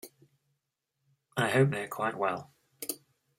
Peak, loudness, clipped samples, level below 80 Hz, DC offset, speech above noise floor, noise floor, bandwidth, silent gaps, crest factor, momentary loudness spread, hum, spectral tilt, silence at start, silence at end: -12 dBFS; -31 LUFS; under 0.1%; -74 dBFS; under 0.1%; 54 dB; -83 dBFS; 16.5 kHz; none; 22 dB; 15 LU; none; -5.5 dB/octave; 0.05 s; 0.4 s